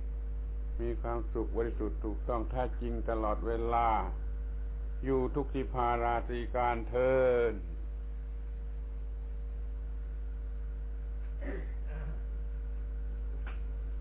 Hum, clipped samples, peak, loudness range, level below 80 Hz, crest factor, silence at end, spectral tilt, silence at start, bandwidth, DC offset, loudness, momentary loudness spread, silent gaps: none; under 0.1%; -18 dBFS; 10 LU; -36 dBFS; 16 dB; 0 s; -7 dB/octave; 0 s; 4 kHz; under 0.1%; -36 LUFS; 12 LU; none